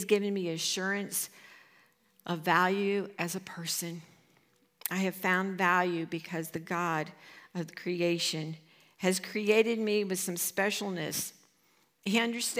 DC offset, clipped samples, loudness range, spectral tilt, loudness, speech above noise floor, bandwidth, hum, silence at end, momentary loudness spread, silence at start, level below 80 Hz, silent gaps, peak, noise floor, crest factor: under 0.1%; under 0.1%; 3 LU; -3.5 dB/octave; -31 LUFS; 38 dB; 16.5 kHz; none; 0 s; 13 LU; 0 s; -84 dBFS; none; -10 dBFS; -69 dBFS; 22 dB